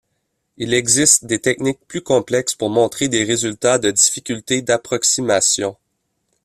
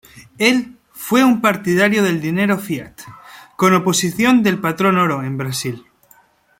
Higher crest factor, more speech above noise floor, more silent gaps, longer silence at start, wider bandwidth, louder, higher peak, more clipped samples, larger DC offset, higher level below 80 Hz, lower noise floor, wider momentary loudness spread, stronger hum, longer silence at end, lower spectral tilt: about the same, 18 dB vs 16 dB; first, 54 dB vs 37 dB; neither; first, 0.6 s vs 0.15 s; second, 15 kHz vs 17 kHz; about the same, -16 LUFS vs -16 LUFS; about the same, 0 dBFS vs -2 dBFS; neither; neither; about the same, -56 dBFS vs -56 dBFS; first, -71 dBFS vs -53 dBFS; second, 9 LU vs 13 LU; neither; about the same, 0.7 s vs 0.8 s; second, -2.5 dB/octave vs -4.5 dB/octave